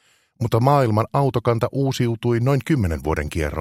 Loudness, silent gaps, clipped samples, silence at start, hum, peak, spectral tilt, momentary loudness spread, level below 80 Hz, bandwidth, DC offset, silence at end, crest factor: -20 LUFS; none; under 0.1%; 0.4 s; none; -2 dBFS; -7.5 dB/octave; 7 LU; -38 dBFS; 15.5 kHz; under 0.1%; 0 s; 18 dB